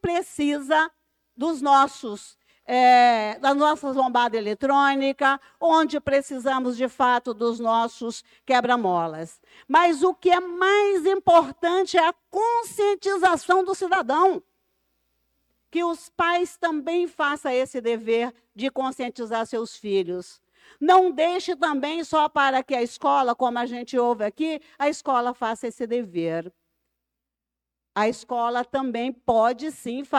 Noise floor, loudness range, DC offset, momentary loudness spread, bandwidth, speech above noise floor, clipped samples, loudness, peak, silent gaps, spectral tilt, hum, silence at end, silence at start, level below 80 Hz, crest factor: -87 dBFS; 7 LU; under 0.1%; 10 LU; 13.5 kHz; 64 dB; under 0.1%; -23 LUFS; -6 dBFS; none; -4 dB/octave; none; 0 s; 0.05 s; -64 dBFS; 16 dB